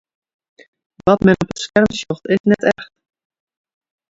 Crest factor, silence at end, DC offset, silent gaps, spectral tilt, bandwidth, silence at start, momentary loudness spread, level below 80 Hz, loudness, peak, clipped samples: 18 dB; 1.3 s; under 0.1%; 2.40-2.44 s; -6 dB/octave; 8 kHz; 1.05 s; 7 LU; -46 dBFS; -16 LUFS; 0 dBFS; under 0.1%